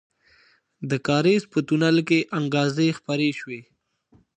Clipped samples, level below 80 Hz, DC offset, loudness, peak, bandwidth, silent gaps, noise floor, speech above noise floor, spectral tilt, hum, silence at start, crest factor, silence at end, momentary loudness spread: under 0.1%; -66 dBFS; under 0.1%; -22 LUFS; -6 dBFS; 9.2 kHz; none; -60 dBFS; 38 dB; -6 dB/octave; none; 0.8 s; 16 dB; 0.75 s; 14 LU